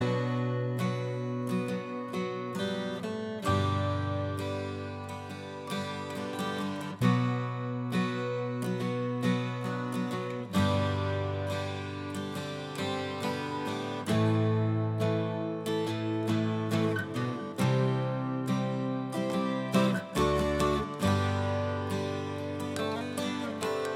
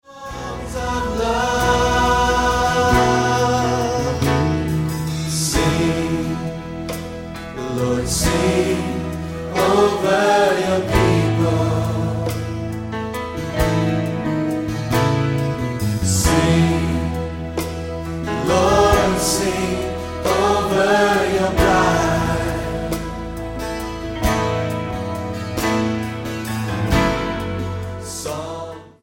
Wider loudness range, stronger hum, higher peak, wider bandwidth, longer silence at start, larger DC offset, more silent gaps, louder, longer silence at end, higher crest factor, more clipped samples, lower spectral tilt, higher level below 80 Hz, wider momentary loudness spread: about the same, 4 LU vs 5 LU; neither; second, -12 dBFS vs -2 dBFS; about the same, 16 kHz vs 17 kHz; about the same, 0 s vs 0.1 s; neither; neither; second, -32 LUFS vs -19 LUFS; second, 0 s vs 0.15 s; about the same, 18 dB vs 16 dB; neither; first, -6.5 dB/octave vs -5 dB/octave; second, -54 dBFS vs -32 dBFS; second, 8 LU vs 12 LU